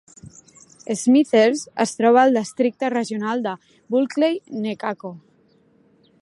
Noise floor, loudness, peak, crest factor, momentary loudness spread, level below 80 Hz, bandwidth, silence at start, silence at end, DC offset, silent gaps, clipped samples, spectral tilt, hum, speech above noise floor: -58 dBFS; -20 LUFS; -2 dBFS; 18 dB; 14 LU; -70 dBFS; 11.5 kHz; 0.25 s; 1.05 s; under 0.1%; none; under 0.1%; -4.5 dB/octave; none; 39 dB